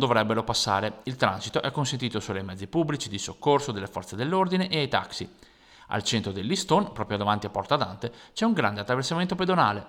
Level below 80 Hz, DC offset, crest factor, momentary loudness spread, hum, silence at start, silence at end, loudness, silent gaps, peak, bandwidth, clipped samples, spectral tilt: -58 dBFS; under 0.1%; 20 dB; 9 LU; none; 0 s; 0 s; -27 LUFS; none; -6 dBFS; 16.5 kHz; under 0.1%; -4.5 dB/octave